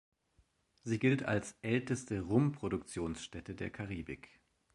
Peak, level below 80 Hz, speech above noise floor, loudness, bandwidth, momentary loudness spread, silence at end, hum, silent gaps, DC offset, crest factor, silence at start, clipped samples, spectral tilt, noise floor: -16 dBFS; -60 dBFS; 38 dB; -36 LUFS; 11.5 kHz; 13 LU; 0.6 s; none; none; under 0.1%; 22 dB; 0.85 s; under 0.1%; -6.5 dB/octave; -73 dBFS